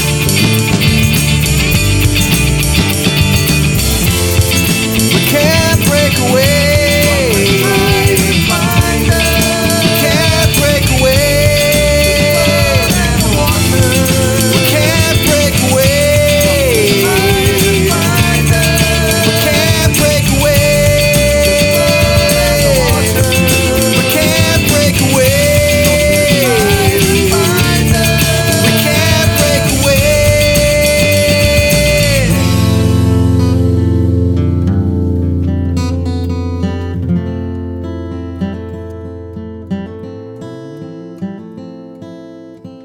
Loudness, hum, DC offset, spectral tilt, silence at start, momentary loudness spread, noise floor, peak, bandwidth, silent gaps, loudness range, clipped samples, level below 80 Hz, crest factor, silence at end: -10 LUFS; none; under 0.1%; -4 dB/octave; 0 s; 12 LU; -32 dBFS; 0 dBFS; over 20 kHz; none; 9 LU; under 0.1%; -22 dBFS; 10 dB; 0 s